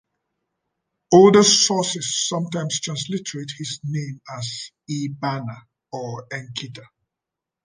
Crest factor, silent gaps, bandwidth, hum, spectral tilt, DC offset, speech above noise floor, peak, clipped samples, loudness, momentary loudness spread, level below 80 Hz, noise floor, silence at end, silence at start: 20 dB; none; 10 kHz; none; -4 dB/octave; under 0.1%; 65 dB; -2 dBFS; under 0.1%; -20 LUFS; 19 LU; -64 dBFS; -86 dBFS; 0.8 s; 1.1 s